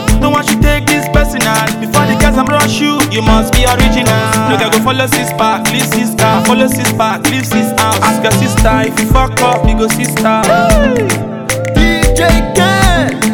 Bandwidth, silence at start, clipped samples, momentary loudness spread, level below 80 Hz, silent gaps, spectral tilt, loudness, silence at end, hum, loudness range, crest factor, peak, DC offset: 18.5 kHz; 0 s; 0.4%; 3 LU; -18 dBFS; none; -4.5 dB/octave; -10 LUFS; 0 s; none; 1 LU; 10 dB; 0 dBFS; under 0.1%